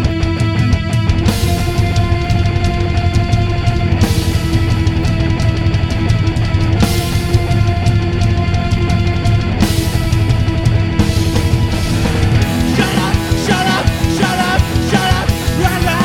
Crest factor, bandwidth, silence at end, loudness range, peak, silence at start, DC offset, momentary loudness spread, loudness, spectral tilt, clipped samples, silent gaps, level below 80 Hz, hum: 12 dB; 16.5 kHz; 0 s; 1 LU; 0 dBFS; 0 s; under 0.1%; 2 LU; -14 LUFS; -6 dB/octave; under 0.1%; none; -20 dBFS; none